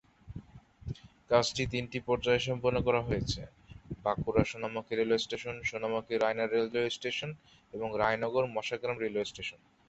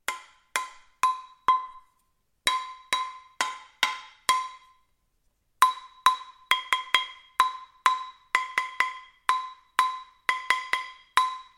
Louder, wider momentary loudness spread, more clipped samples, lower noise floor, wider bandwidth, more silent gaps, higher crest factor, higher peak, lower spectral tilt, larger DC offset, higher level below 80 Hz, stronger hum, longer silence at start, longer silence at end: second, -32 LUFS vs -27 LUFS; first, 17 LU vs 8 LU; neither; second, -52 dBFS vs -71 dBFS; second, 8.2 kHz vs 16.5 kHz; neither; about the same, 22 dB vs 26 dB; second, -10 dBFS vs -4 dBFS; first, -5 dB/octave vs 2 dB/octave; neither; first, -54 dBFS vs -70 dBFS; neither; first, 0.25 s vs 0.1 s; first, 0.35 s vs 0.15 s